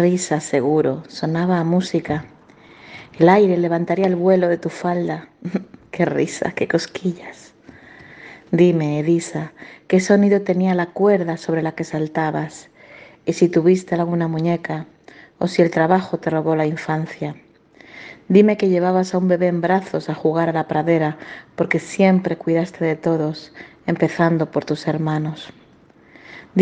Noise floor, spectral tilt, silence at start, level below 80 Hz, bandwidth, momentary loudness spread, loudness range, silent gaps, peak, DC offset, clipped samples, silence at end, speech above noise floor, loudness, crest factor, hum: -50 dBFS; -7 dB/octave; 0 s; -60 dBFS; 9.4 kHz; 14 LU; 4 LU; none; 0 dBFS; under 0.1%; under 0.1%; 0 s; 32 dB; -19 LUFS; 20 dB; none